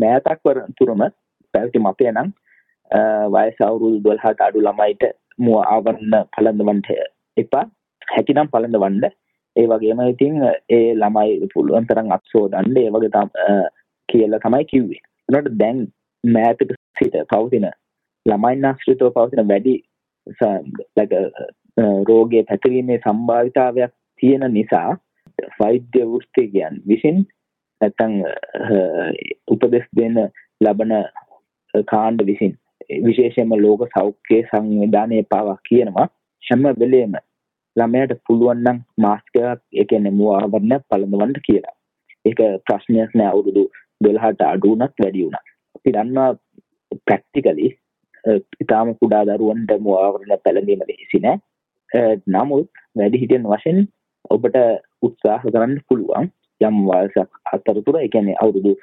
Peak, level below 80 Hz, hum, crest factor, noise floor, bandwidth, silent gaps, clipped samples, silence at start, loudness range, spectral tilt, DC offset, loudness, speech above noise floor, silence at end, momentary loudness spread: -2 dBFS; -60 dBFS; none; 16 dB; -55 dBFS; 4 kHz; 16.77-16.94 s; under 0.1%; 0 s; 3 LU; -10.5 dB/octave; under 0.1%; -17 LUFS; 39 dB; 0.05 s; 7 LU